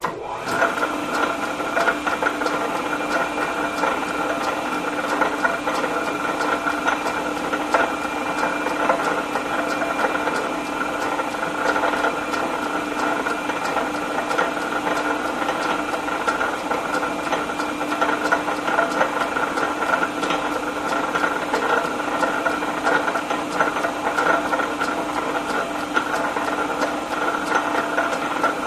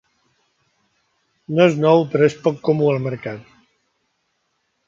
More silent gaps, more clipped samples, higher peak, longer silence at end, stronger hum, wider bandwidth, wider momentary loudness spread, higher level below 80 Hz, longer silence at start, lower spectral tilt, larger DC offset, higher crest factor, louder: neither; neither; about the same, -2 dBFS vs -2 dBFS; second, 0 s vs 1.45 s; neither; first, 15.5 kHz vs 7.6 kHz; second, 4 LU vs 14 LU; first, -54 dBFS vs -64 dBFS; second, 0 s vs 1.5 s; second, -3.5 dB/octave vs -7.5 dB/octave; neither; about the same, 20 dB vs 20 dB; second, -22 LUFS vs -18 LUFS